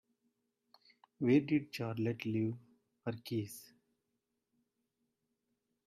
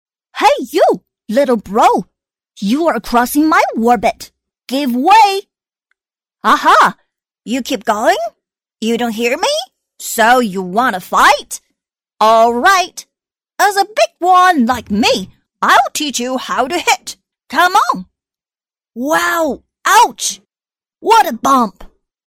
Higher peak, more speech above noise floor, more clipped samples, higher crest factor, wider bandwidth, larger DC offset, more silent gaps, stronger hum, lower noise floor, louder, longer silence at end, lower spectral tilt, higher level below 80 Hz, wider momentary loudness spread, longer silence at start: second, -18 dBFS vs 0 dBFS; second, 51 dB vs over 78 dB; neither; first, 20 dB vs 14 dB; second, 14.5 kHz vs 16.5 kHz; neither; neither; neither; second, -86 dBFS vs under -90 dBFS; second, -36 LUFS vs -13 LUFS; first, 2.25 s vs 0.45 s; first, -7 dB/octave vs -3 dB/octave; second, -78 dBFS vs -48 dBFS; first, 16 LU vs 13 LU; first, 1.2 s vs 0.35 s